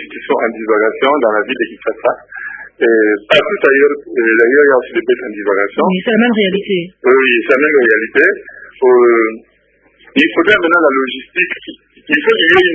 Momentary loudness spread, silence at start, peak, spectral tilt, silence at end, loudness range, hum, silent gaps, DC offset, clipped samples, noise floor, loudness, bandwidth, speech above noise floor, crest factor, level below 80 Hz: 9 LU; 0 s; 0 dBFS; -6.5 dB/octave; 0 s; 2 LU; none; none; under 0.1%; under 0.1%; -53 dBFS; -12 LUFS; 8 kHz; 41 dB; 12 dB; -54 dBFS